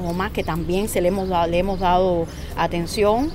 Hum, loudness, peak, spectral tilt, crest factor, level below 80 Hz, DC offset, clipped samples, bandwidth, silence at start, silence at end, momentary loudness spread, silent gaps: none; -21 LUFS; -6 dBFS; -5.5 dB/octave; 14 dB; -32 dBFS; under 0.1%; under 0.1%; 16 kHz; 0 s; 0 s; 6 LU; none